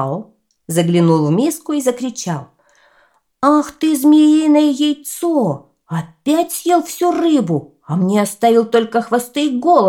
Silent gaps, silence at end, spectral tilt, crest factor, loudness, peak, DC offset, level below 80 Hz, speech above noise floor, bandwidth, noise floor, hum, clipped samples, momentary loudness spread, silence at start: none; 0 s; -6 dB/octave; 14 dB; -15 LUFS; 0 dBFS; under 0.1%; -64 dBFS; 42 dB; 17 kHz; -56 dBFS; none; under 0.1%; 12 LU; 0 s